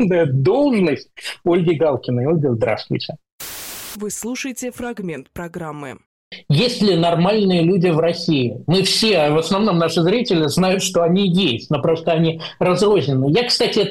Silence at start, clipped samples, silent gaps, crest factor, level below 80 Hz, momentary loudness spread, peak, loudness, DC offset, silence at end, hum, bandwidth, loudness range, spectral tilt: 0 s; under 0.1%; 3.32-3.39 s, 6.06-6.31 s; 10 dB; -52 dBFS; 14 LU; -8 dBFS; -17 LUFS; under 0.1%; 0 s; none; 16.5 kHz; 9 LU; -5.5 dB/octave